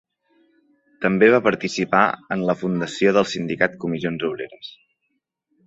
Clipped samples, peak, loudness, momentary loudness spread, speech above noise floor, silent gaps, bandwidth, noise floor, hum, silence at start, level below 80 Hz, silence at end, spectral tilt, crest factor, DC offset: under 0.1%; -2 dBFS; -20 LUFS; 13 LU; 54 dB; none; 8 kHz; -74 dBFS; none; 1 s; -60 dBFS; 0.95 s; -5.5 dB/octave; 20 dB; under 0.1%